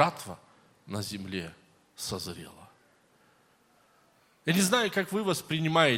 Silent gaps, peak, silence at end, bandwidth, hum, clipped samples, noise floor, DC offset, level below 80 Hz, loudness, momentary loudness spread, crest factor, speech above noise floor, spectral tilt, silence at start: none; -6 dBFS; 0 s; 16.5 kHz; none; under 0.1%; -65 dBFS; under 0.1%; -70 dBFS; -30 LUFS; 20 LU; 26 dB; 36 dB; -4 dB/octave; 0 s